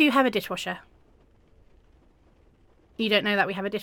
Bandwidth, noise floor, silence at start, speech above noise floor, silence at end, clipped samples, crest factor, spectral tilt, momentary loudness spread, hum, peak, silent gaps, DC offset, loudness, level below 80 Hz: 17.5 kHz; -59 dBFS; 0 s; 34 dB; 0 s; under 0.1%; 20 dB; -4.5 dB/octave; 14 LU; none; -8 dBFS; none; under 0.1%; -25 LUFS; -60 dBFS